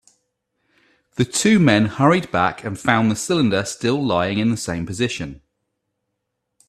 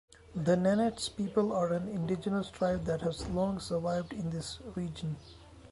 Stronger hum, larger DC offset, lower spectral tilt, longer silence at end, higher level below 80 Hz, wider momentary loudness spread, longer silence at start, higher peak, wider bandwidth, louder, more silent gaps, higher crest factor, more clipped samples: neither; neither; second, -5 dB/octave vs -6.5 dB/octave; first, 1.35 s vs 0 s; about the same, -52 dBFS vs -54 dBFS; about the same, 9 LU vs 10 LU; first, 1.2 s vs 0.3 s; first, 0 dBFS vs -16 dBFS; first, 13.5 kHz vs 11.5 kHz; first, -19 LUFS vs -33 LUFS; neither; about the same, 20 dB vs 16 dB; neither